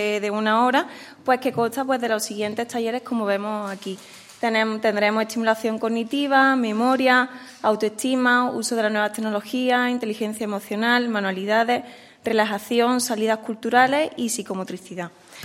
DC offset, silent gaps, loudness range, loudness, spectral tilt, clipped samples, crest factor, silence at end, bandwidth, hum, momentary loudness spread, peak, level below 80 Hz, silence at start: under 0.1%; none; 4 LU; -22 LUFS; -3.5 dB/octave; under 0.1%; 18 dB; 0 s; 16 kHz; none; 12 LU; -4 dBFS; -74 dBFS; 0 s